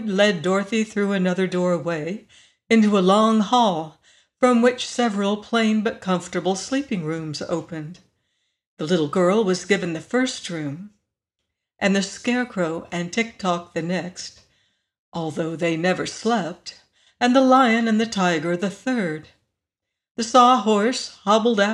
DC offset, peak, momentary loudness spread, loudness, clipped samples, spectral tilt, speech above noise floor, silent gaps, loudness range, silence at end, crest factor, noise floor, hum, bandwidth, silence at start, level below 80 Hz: under 0.1%; -2 dBFS; 14 LU; -21 LUFS; under 0.1%; -5 dB/octave; 64 dB; 8.67-8.77 s, 14.99-15.12 s, 20.11-20.15 s; 6 LU; 0 s; 18 dB; -84 dBFS; none; 11 kHz; 0 s; -64 dBFS